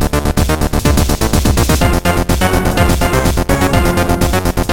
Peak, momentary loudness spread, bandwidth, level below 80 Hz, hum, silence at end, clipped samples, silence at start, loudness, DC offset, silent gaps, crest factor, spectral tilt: 0 dBFS; 2 LU; 17 kHz; -18 dBFS; none; 0 s; under 0.1%; 0 s; -13 LUFS; 4%; none; 12 dB; -5 dB/octave